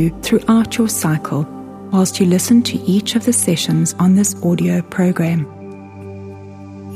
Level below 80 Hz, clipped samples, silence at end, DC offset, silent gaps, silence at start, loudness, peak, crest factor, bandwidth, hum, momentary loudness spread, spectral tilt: -46 dBFS; under 0.1%; 0 s; under 0.1%; none; 0 s; -15 LUFS; 0 dBFS; 16 dB; 15.5 kHz; none; 20 LU; -5 dB/octave